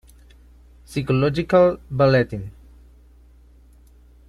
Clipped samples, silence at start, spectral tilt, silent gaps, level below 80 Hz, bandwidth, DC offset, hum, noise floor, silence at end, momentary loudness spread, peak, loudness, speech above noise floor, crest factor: under 0.1%; 0.9 s; -7.5 dB/octave; none; -46 dBFS; 12.5 kHz; under 0.1%; 60 Hz at -45 dBFS; -50 dBFS; 1.75 s; 14 LU; -6 dBFS; -19 LUFS; 31 dB; 18 dB